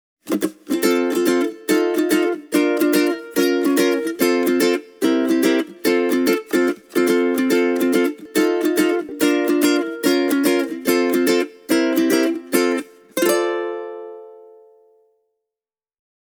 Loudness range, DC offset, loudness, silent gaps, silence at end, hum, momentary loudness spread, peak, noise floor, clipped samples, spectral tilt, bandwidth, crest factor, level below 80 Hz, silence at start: 4 LU; under 0.1%; -19 LUFS; none; 2 s; none; 4 LU; -2 dBFS; under -90 dBFS; under 0.1%; -3.5 dB/octave; over 20 kHz; 16 dB; -66 dBFS; 0.25 s